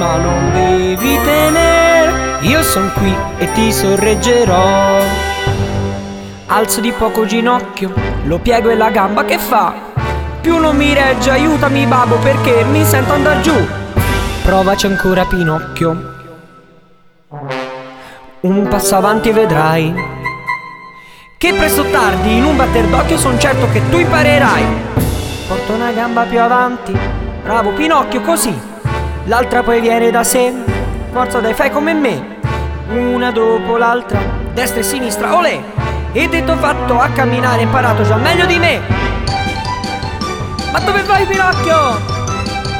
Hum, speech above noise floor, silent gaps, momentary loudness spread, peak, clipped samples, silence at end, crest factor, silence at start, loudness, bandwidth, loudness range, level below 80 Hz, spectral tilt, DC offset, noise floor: none; 34 dB; none; 9 LU; 0 dBFS; under 0.1%; 0 s; 12 dB; 0 s; -13 LUFS; over 20 kHz; 4 LU; -26 dBFS; -5 dB/octave; under 0.1%; -45 dBFS